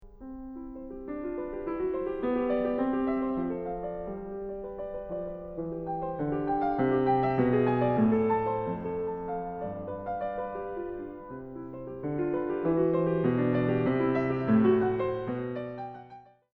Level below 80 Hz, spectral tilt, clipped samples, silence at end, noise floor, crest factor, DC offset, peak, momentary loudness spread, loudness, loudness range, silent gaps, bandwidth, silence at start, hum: -52 dBFS; -10.5 dB/octave; under 0.1%; 0.35 s; -52 dBFS; 16 dB; under 0.1%; -12 dBFS; 15 LU; -30 LUFS; 8 LU; none; 4.6 kHz; 0 s; none